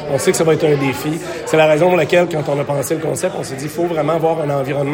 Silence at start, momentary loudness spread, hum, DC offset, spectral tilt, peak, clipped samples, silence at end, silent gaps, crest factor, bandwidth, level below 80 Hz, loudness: 0 s; 9 LU; none; under 0.1%; -5.5 dB/octave; 0 dBFS; under 0.1%; 0 s; none; 14 dB; 17 kHz; -52 dBFS; -16 LUFS